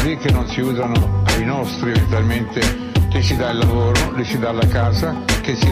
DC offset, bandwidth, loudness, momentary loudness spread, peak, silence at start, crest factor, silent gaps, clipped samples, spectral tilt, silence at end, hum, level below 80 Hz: under 0.1%; 15.5 kHz; -18 LUFS; 4 LU; -6 dBFS; 0 s; 10 dB; none; under 0.1%; -5.5 dB/octave; 0 s; none; -26 dBFS